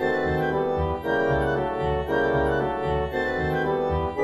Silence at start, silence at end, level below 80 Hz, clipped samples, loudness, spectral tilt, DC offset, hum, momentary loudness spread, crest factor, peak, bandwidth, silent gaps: 0 s; 0 s; -38 dBFS; under 0.1%; -24 LUFS; -7.5 dB/octave; under 0.1%; none; 3 LU; 14 dB; -10 dBFS; 14 kHz; none